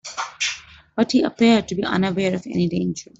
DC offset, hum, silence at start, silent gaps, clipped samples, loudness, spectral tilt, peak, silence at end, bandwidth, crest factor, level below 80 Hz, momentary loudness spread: under 0.1%; none; 0.05 s; none; under 0.1%; -21 LUFS; -5 dB/octave; -4 dBFS; 0.15 s; 8 kHz; 18 dB; -54 dBFS; 10 LU